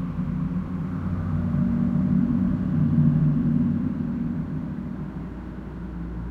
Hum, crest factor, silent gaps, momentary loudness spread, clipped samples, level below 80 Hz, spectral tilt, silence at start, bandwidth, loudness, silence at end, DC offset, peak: none; 16 dB; none; 14 LU; under 0.1%; -40 dBFS; -11 dB/octave; 0 s; 3.9 kHz; -25 LUFS; 0 s; under 0.1%; -8 dBFS